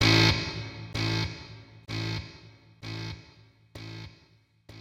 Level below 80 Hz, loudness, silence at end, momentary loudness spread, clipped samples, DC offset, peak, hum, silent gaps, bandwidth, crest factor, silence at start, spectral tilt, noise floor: -48 dBFS; -29 LUFS; 0 s; 24 LU; under 0.1%; under 0.1%; -8 dBFS; none; none; 15 kHz; 24 dB; 0 s; -4.5 dB/octave; -62 dBFS